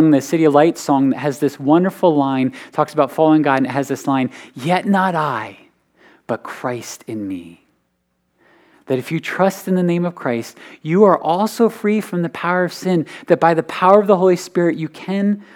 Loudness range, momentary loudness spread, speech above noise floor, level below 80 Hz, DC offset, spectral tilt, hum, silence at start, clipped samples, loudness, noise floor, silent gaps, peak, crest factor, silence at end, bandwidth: 10 LU; 13 LU; 51 dB; -72 dBFS; under 0.1%; -6.5 dB/octave; none; 0 s; under 0.1%; -17 LUFS; -68 dBFS; none; 0 dBFS; 18 dB; 0.15 s; 18 kHz